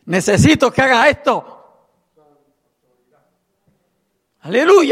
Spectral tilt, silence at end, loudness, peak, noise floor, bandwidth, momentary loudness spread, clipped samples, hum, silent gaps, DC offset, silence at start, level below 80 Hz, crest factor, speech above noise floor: -5 dB/octave; 0 s; -13 LUFS; 0 dBFS; -68 dBFS; 15 kHz; 8 LU; under 0.1%; none; none; under 0.1%; 0.05 s; -44 dBFS; 16 dB; 55 dB